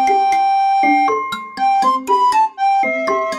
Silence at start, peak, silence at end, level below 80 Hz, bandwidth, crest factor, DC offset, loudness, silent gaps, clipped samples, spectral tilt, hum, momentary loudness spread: 0 s; -4 dBFS; 0 s; -60 dBFS; 13.5 kHz; 12 dB; under 0.1%; -15 LUFS; none; under 0.1%; -3 dB/octave; none; 5 LU